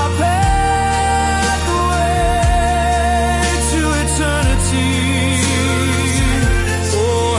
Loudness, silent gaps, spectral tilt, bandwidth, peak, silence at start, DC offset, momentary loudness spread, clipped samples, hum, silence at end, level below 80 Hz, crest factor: -15 LUFS; none; -4.5 dB/octave; 11.5 kHz; -4 dBFS; 0 s; under 0.1%; 1 LU; under 0.1%; none; 0 s; -22 dBFS; 10 dB